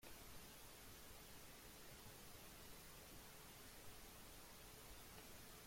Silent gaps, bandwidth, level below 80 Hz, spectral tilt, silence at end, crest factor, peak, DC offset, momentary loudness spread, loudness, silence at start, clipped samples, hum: none; 16.5 kHz; -68 dBFS; -2.5 dB/octave; 0 s; 14 dB; -46 dBFS; under 0.1%; 1 LU; -59 LUFS; 0 s; under 0.1%; none